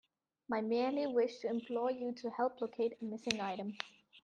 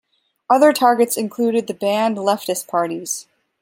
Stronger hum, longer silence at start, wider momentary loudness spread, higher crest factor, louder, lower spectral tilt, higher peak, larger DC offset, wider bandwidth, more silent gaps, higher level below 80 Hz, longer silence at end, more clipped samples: neither; about the same, 0.5 s vs 0.5 s; about the same, 8 LU vs 9 LU; first, 24 dB vs 18 dB; second, -38 LUFS vs -18 LUFS; about the same, -4.5 dB/octave vs -3.5 dB/octave; second, -14 dBFS vs -2 dBFS; neither; second, 9.6 kHz vs 16.5 kHz; neither; second, -82 dBFS vs -72 dBFS; second, 0.05 s vs 0.4 s; neither